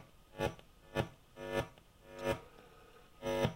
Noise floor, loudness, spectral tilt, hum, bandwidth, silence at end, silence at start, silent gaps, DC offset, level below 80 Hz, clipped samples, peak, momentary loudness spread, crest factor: -60 dBFS; -41 LUFS; -5.5 dB/octave; none; 16 kHz; 0 s; 0 s; none; under 0.1%; -56 dBFS; under 0.1%; -18 dBFS; 20 LU; 24 dB